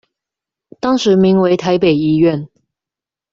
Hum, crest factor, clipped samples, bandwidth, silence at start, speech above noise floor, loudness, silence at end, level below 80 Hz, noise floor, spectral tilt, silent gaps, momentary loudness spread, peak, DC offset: none; 12 dB; under 0.1%; 7.6 kHz; 0.85 s; 75 dB; -13 LUFS; 0.85 s; -52 dBFS; -87 dBFS; -7 dB/octave; none; 7 LU; -2 dBFS; under 0.1%